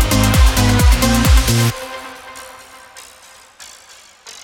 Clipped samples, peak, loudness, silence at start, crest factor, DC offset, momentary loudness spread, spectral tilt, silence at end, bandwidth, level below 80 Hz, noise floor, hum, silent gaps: under 0.1%; 0 dBFS; -13 LUFS; 0 s; 14 dB; under 0.1%; 24 LU; -4.5 dB/octave; 0.1 s; 19 kHz; -18 dBFS; -43 dBFS; none; none